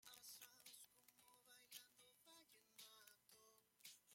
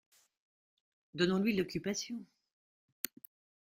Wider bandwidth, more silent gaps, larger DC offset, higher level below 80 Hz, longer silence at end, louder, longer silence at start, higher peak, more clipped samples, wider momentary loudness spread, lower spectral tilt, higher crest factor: about the same, 16.5 kHz vs 16 kHz; neither; neither; second, under -90 dBFS vs -72 dBFS; second, 0 s vs 1.4 s; second, -64 LUFS vs -36 LUFS; second, 0 s vs 1.15 s; second, -44 dBFS vs -12 dBFS; neither; second, 9 LU vs 16 LU; second, 0.5 dB/octave vs -4.5 dB/octave; about the same, 24 dB vs 26 dB